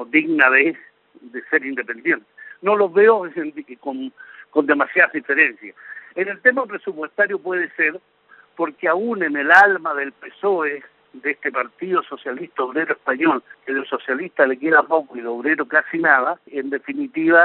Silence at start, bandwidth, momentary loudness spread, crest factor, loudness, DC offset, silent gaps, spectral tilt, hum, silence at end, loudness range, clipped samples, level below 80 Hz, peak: 0 s; 4.5 kHz; 15 LU; 20 dB; -19 LUFS; under 0.1%; none; -2.5 dB/octave; none; 0 s; 4 LU; under 0.1%; -72 dBFS; 0 dBFS